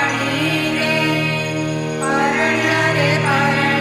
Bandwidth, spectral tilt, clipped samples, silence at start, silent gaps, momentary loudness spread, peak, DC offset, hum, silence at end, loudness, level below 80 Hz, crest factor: 15.5 kHz; -4.5 dB/octave; under 0.1%; 0 s; none; 5 LU; -4 dBFS; under 0.1%; none; 0 s; -17 LUFS; -52 dBFS; 14 dB